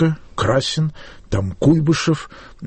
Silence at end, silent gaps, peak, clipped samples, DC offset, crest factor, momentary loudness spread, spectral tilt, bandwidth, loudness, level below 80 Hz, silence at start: 0 s; none; -4 dBFS; under 0.1%; under 0.1%; 16 dB; 9 LU; -6 dB/octave; 8.8 kHz; -19 LUFS; -40 dBFS; 0 s